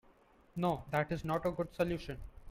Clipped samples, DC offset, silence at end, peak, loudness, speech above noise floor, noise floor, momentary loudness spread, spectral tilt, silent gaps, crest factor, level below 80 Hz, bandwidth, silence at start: under 0.1%; under 0.1%; 0 s; -18 dBFS; -37 LUFS; 29 dB; -65 dBFS; 12 LU; -7 dB/octave; none; 20 dB; -54 dBFS; 16.5 kHz; 0.55 s